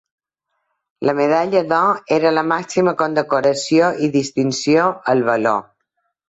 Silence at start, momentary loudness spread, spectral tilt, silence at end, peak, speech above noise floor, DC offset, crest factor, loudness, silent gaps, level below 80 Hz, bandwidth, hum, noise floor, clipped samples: 1 s; 4 LU; -5 dB/octave; 0.65 s; -2 dBFS; 58 dB; under 0.1%; 16 dB; -17 LUFS; none; -60 dBFS; 8.2 kHz; none; -74 dBFS; under 0.1%